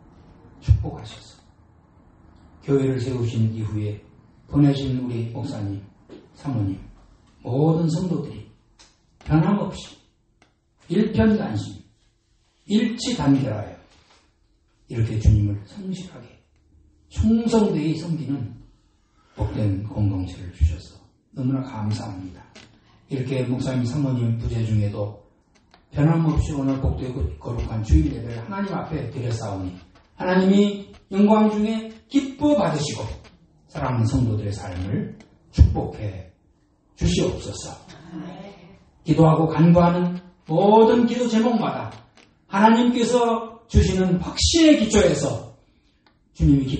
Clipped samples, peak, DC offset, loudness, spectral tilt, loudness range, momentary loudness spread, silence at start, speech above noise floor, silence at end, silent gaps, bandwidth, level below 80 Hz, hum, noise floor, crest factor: under 0.1%; -2 dBFS; under 0.1%; -22 LUFS; -6.5 dB/octave; 8 LU; 19 LU; 0.65 s; 43 dB; 0 s; none; 8.8 kHz; -34 dBFS; none; -64 dBFS; 20 dB